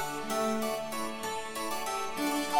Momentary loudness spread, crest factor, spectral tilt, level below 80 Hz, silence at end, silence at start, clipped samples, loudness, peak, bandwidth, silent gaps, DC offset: 4 LU; 18 dB; -2.5 dB/octave; -62 dBFS; 0 s; 0 s; under 0.1%; -33 LUFS; -14 dBFS; over 20 kHz; none; under 0.1%